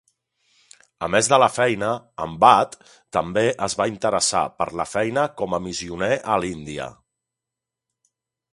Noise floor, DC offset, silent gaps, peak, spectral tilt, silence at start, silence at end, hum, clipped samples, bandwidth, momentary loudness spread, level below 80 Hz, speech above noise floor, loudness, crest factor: -86 dBFS; under 0.1%; none; 0 dBFS; -3.5 dB/octave; 1 s; 1.6 s; none; under 0.1%; 11.5 kHz; 13 LU; -54 dBFS; 65 dB; -21 LUFS; 22 dB